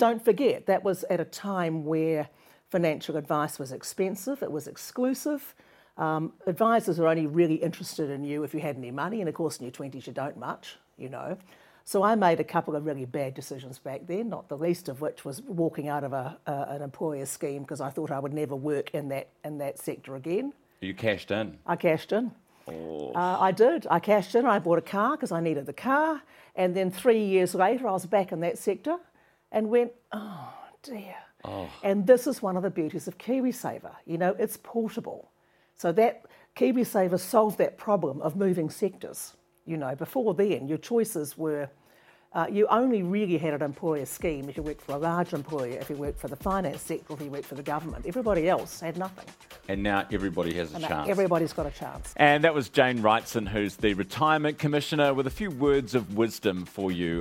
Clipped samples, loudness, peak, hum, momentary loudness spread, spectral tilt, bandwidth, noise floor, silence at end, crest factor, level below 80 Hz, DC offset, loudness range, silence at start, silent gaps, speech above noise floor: under 0.1%; -28 LUFS; -4 dBFS; none; 14 LU; -5.5 dB/octave; 16.5 kHz; -63 dBFS; 0 s; 24 dB; -54 dBFS; under 0.1%; 7 LU; 0 s; none; 35 dB